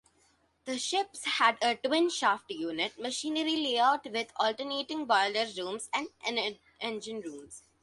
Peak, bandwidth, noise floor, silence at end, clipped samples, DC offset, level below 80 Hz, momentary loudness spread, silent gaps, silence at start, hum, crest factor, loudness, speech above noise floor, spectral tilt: -10 dBFS; 11.5 kHz; -69 dBFS; 0.25 s; under 0.1%; under 0.1%; -76 dBFS; 12 LU; none; 0.65 s; none; 22 dB; -30 LUFS; 38 dB; -1.5 dB/octave